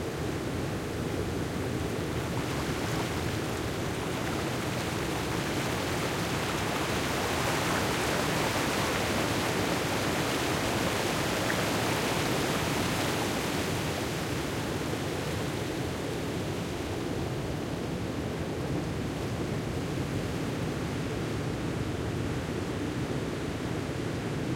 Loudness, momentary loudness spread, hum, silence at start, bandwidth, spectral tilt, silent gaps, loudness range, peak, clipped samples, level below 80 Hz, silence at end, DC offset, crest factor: -31 LUFS; 5 LU; none; 0 s; 16.5 kHz; -4.5 dB/octave; none; 5 LU; -14 dBFS; under 0.1%; -48 dBFS; 0 s; under 0.1%; 16 dB